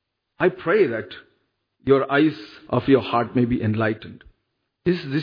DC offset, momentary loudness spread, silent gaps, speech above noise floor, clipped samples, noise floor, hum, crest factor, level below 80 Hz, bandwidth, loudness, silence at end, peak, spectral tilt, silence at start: under 0.1%; 14 LU; none; 54 dB; under 0.1%; -75 dBFS; none; 18 dB; -52 dBFS; 5.2 kHz; -21 LUFS; 0 s; -4 dBFS; -9 dB/octave; 0.4 s